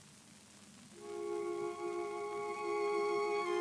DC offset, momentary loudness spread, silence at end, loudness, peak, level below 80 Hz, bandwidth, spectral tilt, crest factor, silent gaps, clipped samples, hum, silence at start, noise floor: under 0.1%; 22 LU; 0 s; -38 LUFS; -24 dBFS; -84 dBFS; 11 kHz; -4 dB/octave; 14 dB; none; under 0.1%; none; 0 s; -59 dBFS